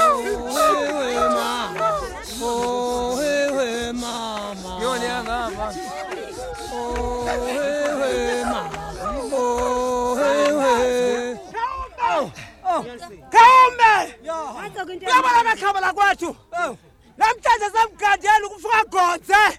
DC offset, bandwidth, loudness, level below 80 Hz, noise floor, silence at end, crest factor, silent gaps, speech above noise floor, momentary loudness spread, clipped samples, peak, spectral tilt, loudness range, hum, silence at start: under 0.1%; 16 kHz; -20 LUFS; -44 dBFS; -42 dBFS; 0 s; 20 dB; none; 23 dB; 14 LU; under 0.1%; 0 dBFS; -3 dB/octave; 9 LU; none; 0 s